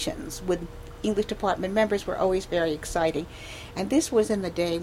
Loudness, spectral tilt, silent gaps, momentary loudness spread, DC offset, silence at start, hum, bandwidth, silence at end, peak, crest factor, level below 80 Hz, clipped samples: -27 LUFS; -4.5 dB/octave; none; 10 LU; under 0.1%; 0 s; none; 16.5 kHz; 0 s; -10 dBFS; 16 dB; -44 dBFS; under 0.1%